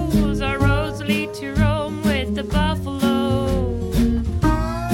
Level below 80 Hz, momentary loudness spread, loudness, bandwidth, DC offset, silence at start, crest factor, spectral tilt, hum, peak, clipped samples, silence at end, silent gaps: -26 dBFS; 3 LU; -21 LUFS; 17 kHz; under 0.1%; 0 s; 14 dB; -6.5 dB/octave; none; -6 dBFS; under 0.1%; 0 s; none